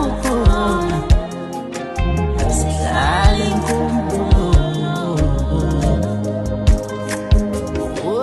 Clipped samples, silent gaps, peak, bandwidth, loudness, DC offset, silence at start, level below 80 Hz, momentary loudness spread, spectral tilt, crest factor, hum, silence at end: under 0.1%; none; -2 dBFS; 12.5 kHz; -18 LUFS; under 0.1%; 0 s; -20 dBFS; 7 LU; -6 dB/octave; 14 dB; none; 0 s